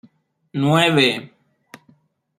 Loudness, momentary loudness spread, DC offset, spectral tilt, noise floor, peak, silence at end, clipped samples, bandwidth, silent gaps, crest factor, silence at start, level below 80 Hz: -17 LUFS; 15 LU; under 0.1%; -5 dB/octave; -58 dBFS; -2 dBFS; 1.15 s; under 0.1%; 14 kHz; none; 20 dB; 0.55 s; -62 dBFS